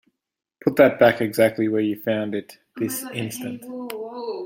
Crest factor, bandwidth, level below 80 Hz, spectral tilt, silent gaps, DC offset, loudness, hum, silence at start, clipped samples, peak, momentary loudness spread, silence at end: 22 dB; 17 kHz; -64 dBFS; -5.5 dB/octave; none; under 0.1%; -22 LUFS; none; 0.65 s; under 0.1%; -2 dBFS; 15 LU; 0 s